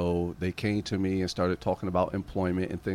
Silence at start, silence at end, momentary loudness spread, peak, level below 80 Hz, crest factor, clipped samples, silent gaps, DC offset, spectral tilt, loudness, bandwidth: 0 s; 0 s; 3 LU; -14 dBFS; -50 dBFS; 16 dB; under 0.1%; none; under 0.1%; -7 dB/octave; -30 LUFS; 14.5 kHz